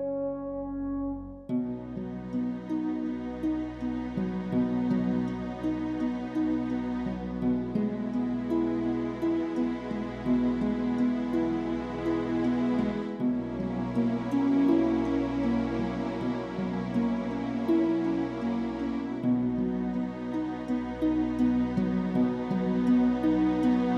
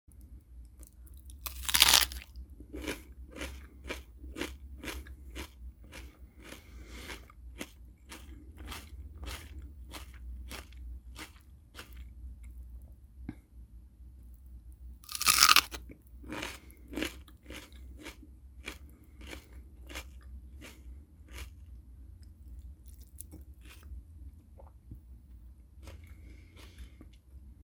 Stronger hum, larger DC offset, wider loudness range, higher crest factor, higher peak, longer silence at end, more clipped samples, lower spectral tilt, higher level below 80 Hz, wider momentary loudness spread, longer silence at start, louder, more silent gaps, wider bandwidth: neither; neither; second, 3 LU vs 23 LU; second, 14 dB vs 38 dB; second, -14 dBFS vs 0 dBFS; about the same, 0 s vs 0.05 s; neither; first, -8.5 dB/octave vs -1 dB/octave; about the same, -50 dBFS vs -50 dBFS; second, 7 LU vs 20 LU; about the same, 0 s vs 0.1 s; about the same, -29 LUFS vs -29 LUFS; neither; second, 7 kHz vs over 20 kHz